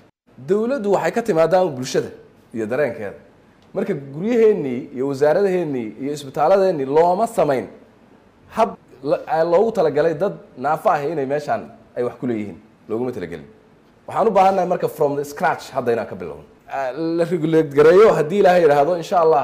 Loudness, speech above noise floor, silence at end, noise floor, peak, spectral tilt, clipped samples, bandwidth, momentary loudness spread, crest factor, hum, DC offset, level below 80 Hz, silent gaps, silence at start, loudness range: -19 LUFS; 33 dB; 0 s; -51 dBFS; -6 dBFS; -6.5 dB/octave; under 0.1%; 15.5 kHz; 15 LU; 14 dB; none; under 0.1%; -58 dBFS; none; 0.4 s; 5 LU